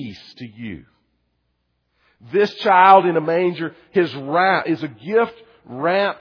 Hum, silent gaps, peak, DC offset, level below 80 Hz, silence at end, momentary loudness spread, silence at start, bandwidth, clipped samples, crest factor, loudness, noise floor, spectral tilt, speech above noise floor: none; none; 0 dBFS; under 0.1%; -64 dBFS; 0.05 s; 22 LU; 0 s; 5.4 kHz; under 0.1%; 20 dB; -17 LUFS; -70 dBFS; -7 dB/octave; 52 dB